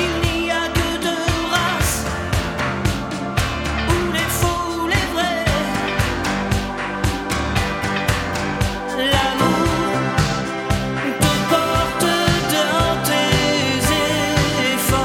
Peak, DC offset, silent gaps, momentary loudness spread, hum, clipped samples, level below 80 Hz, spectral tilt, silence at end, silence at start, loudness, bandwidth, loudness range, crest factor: -2 dBFS; under 0.1%; none; 5 LU; none; under 0.1%; -30 dBFS; -4 dB/octave; 0 s; 0 s; -19 LUFS; 17.5 kHz; 3 LU; 18 dB